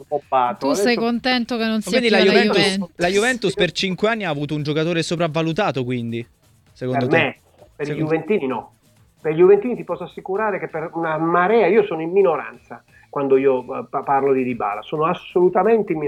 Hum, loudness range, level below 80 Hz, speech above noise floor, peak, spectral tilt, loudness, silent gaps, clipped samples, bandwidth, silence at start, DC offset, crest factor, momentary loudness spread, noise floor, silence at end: none; 5 LU; -56 dBFS; 36 dB; -2 dBFS; -5.5 dB/octave; -19 LUFS; none; under 0.1%; 13.5 kHz; 0 s; under 0.1%; 18 dB; 12 LU; -55 dBFS; 0 s